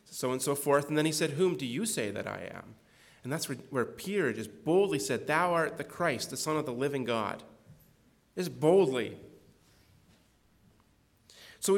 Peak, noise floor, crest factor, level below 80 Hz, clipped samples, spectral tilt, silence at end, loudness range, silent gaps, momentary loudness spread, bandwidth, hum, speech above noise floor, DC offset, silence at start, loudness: -12 dBFS; -66 dBFS; 20 dB; -72 dBFS; under 0.1%; -4.5 dB/octave; 0 s; 3 LU; none; 12 LU; 18 kHz; none; 36 dB; under 0.1%; 0.1 s; -31 LUFS